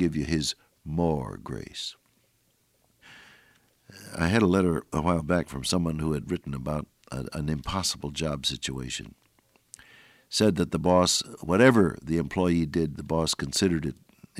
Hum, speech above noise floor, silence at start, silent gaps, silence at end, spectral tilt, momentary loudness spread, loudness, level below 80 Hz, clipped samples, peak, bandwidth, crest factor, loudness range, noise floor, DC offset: none; 42 dB; 0 s; none; 0 s; -5 dB/octave; 14 LU; -27 LUFS; -48 dBFS; under 0.1%; -6 dBFS; 15.5 kHz; 22 dB; 9 LU; -68 dBFS; under 0.1%